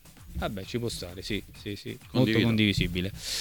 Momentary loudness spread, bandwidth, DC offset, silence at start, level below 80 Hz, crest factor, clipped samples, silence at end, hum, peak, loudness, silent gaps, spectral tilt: 14 LU; 19 kHz; under 0.1%; 0.05 s; -44 dBFS; 20 dB; under 0.1%; 0 s; none; -10 dBFS; -29 LUFS; none; -5 dB/octave